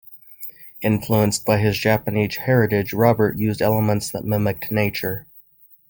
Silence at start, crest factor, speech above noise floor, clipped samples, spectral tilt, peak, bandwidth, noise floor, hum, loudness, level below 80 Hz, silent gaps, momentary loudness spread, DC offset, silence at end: 0.1 s; 18 dB; 33 dB; under 0.1%; -6 dB/octave; -2 dBFS; 17 kHz; -52 dBFS; none; -20 LUFS; -50 dBFS; none; 9 LU; under 0.1%; 0.5 s